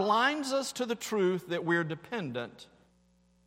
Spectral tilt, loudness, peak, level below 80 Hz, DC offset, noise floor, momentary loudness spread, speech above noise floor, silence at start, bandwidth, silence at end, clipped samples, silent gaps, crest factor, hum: -4.5 dB/octave; -31 LUFS; -14 dBFS; -74 dBFS; under 0.1%; -67 dBFS; 10 LU; 36 dB; 0 s; 16 kHz; 0.8 s; under 0.1%; none; 18 dB; none